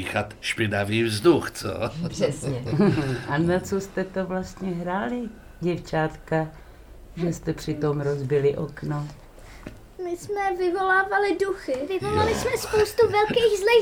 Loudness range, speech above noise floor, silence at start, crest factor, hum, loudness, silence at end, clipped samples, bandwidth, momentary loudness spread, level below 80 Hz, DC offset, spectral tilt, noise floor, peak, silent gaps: 6 LU; 21 dB; 0 s; 18 dB; none; -25 LUFS; 0 s; under 0.1%; 19 kHz; 11 LU; -46 dBFS; under 0.1%; -5.5 dB/octave; -45 dBFS; -6 dBFS; none